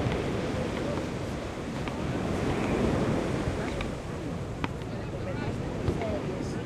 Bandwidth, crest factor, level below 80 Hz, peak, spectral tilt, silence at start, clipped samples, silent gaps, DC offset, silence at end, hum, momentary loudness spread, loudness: 14.5 kHz; 22 dB; -42 dBFS; -10 dBFS; -6.5 dB/octave; 0 s; under 0.1%; none; under 0.1%; 0 s; none; 7 LU; -32 LUFS